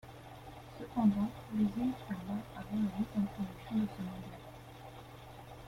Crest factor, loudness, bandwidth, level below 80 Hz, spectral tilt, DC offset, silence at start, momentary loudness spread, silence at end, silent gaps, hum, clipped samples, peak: 18 dB; -36 LUFS; 15.5 kHz; -60 dBFS; -7.5 dB/octave; under 0.1%; 0.05 s; 20 LU; 0 s; none; none; under 0.1%; -18 dBFS